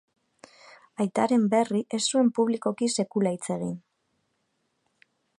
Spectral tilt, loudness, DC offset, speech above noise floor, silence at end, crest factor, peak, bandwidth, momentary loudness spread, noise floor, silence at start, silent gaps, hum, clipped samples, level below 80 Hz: -5 dB/octave; -26 LUFS; under 0.1%; 50 dB; 1.6 s; 18 dB; -10 dBFS; 11.5 kHz; 9 LU; -75 dBFS; 1 s; none; none; under 0.1%; -74 dBFS